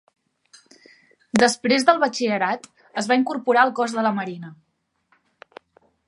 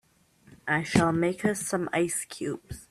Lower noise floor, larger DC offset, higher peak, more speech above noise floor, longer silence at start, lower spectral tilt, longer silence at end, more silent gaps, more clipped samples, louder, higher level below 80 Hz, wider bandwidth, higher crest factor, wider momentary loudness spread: first, -67 dBFS vs -60 dBFS; neither; first, -2 dBFS vs -6 dBFS; first, 46 dB vs 33 dB; first, 1.35 s vs 0.5 s; second, -3.5 dB/octave vs -5 dB/octave; first, 1.55 s vs 0.05 s; neither; neither; first, -21 LUFS vs -27 LUFS; second, -70 dBFS vs -56 dBFS; second, 11.5 kHz vs 14.5 kHz; about the same, 22 dB vs 22 dB; first, 14 LU vs 11 LU